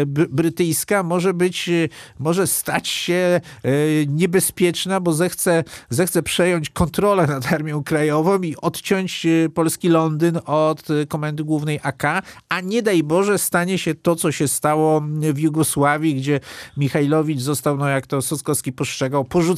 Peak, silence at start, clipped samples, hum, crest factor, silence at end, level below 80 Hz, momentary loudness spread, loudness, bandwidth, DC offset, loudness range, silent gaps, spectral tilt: -4 dBFS; 0 s; under 0.1%; none; 16 dB; 0 s; -50 dBFS; 5 LU; -19 LUFS; 15.5 kHz; under 0.1%; 2 LU; none; -5 dB/octave